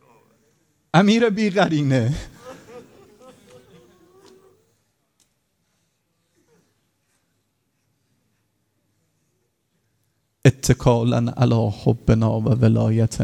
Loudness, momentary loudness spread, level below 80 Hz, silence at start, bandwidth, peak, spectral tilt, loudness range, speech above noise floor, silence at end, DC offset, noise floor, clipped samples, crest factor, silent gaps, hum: -19 LUFS; 10 LU; -44 dBFS; 0.95 s; 13 kHz; 0 dBFS; -6.5 dB/octave; 9 LU; 53 dB; 0 s; under 0.1%; -71 dBFS; under 0.1%; 22 dB; none; none